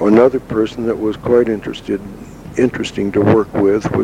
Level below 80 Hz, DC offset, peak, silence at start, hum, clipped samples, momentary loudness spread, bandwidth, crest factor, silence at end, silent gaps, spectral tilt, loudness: -42 dBFS; under 0.1%; 0 dBFS; 0 s; none; under 0.1%; 11 LU; 12.5 kHz; 14 dB; 0 s; none; -7 dB/octave; -16 LUFS